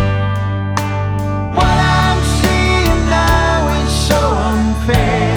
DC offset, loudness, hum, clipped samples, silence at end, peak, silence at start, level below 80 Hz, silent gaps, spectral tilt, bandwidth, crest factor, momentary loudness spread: under 0.1%; -14 LUFS; none; under 0.1%; 0 s; 0 dBFS; 0 s; -20 dBFS; none; -5.5 dB/octave; 18 kHz; 12 dB; 6 LU